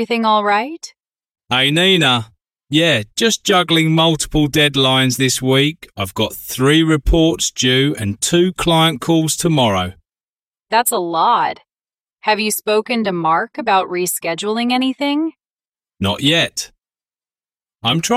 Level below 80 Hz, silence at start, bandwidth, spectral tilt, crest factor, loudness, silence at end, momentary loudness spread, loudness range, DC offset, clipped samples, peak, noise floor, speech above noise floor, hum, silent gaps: -34 dBFS; 0 s; 16.5 kHz; -4 dB/octave; 16 dB; -15 LUFS; 0 s; 8 LU; 4 LU; under 0.1%; under 0.1%; 0 dBFS; under -90 dBFS; over 74 dB; none; 10.20-10.51 s, 15.53-15.57 s